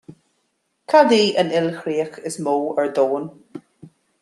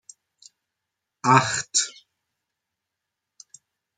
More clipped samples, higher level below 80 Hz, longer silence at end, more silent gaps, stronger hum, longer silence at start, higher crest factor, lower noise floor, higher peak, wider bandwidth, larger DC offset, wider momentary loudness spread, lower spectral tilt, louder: neither; about the same, -72 dBFS vs -70 dBFS; second, 0.35 s vs 2.05 s; neither; neither; second, 0.1 s vs 1.25 s; second, 18 dB vs 26 dB; second, -70 dBFS vs -84 dBFS; about the same, -2 dBFS vs -2 dBFS; first, 12.5 kHz vs 9.6 kHz; neither; first, 21 LU vs 9 LU; first, -4.5 dB/octave vs -2.5 dB/octave; about the same, -19 LUFS vs -21 LUFS